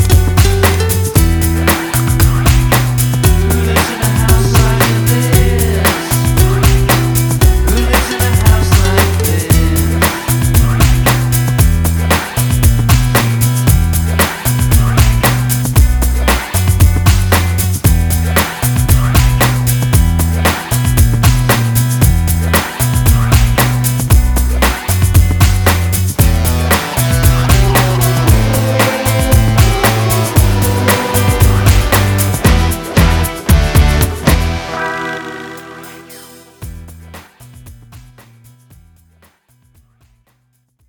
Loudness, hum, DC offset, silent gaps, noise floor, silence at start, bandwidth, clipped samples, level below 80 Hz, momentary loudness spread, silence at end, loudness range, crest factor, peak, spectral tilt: -11 LUFS; none; under 0.1%; none; -58 dBFS; 0 s; over 20 kHz; under 0.1%; -16 dBFS; 4 LU; 2.9 s; 1 LU; 10 dB; 0 dBFS; -5 dB/octave